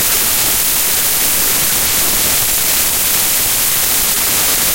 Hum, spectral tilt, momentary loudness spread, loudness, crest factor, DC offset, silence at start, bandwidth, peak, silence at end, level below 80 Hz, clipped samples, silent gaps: none; 0 dB/octave; 0 LU; -10 LUFS; 14 dB; 2%; 0 s; 16.5 kHz; 0 dBFS; 0 s; -36 dBFS; under 0.1%; none